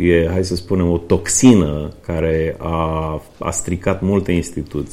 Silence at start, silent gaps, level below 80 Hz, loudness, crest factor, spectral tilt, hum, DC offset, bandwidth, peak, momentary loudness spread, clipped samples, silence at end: 0 s; none; -32 dBFS; -17 LUFS; 16 dB; -5.5 dB/octave; none; under 0.1%; 15 kHz; 0 dBFS; 13 LU; under 0.1%; 0 s